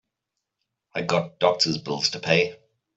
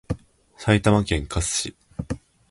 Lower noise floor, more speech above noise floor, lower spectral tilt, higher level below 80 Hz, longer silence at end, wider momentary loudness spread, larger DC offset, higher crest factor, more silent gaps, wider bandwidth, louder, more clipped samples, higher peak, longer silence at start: first, -83 dBFS vs -47 dBFS; first, 60 dB vs 25 dB; about the same, -3.5 dB/octave vs -4.5 dB/octave; second, -64 dBFS vs -36 dBFS; about the same, 0.4 s vs 0.35 s; second, 8 LU vs 16 LU; neither; about the same, 22 dB vs 20 dB; neither; second, 8.2 kHz vs 11.5 kHz; about the same, -23 LUFS vs -23 LUFS; neither; about the same, -4 dBFS vs -6 dBFS; first, 0.95 s vs 0.1 s